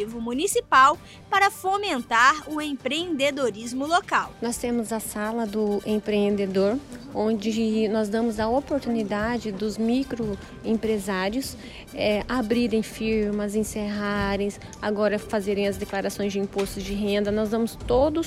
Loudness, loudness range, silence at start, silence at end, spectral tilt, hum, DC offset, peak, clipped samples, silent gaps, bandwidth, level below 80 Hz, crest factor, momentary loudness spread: -25 LUFS; 4 LU; 0 s; 0 s; -4.5 dB/octave; none; under 0.1%; -6 dBFS; under 0.1%; none; 16 kHz; -46 dBFS; 18 dB; 8 LU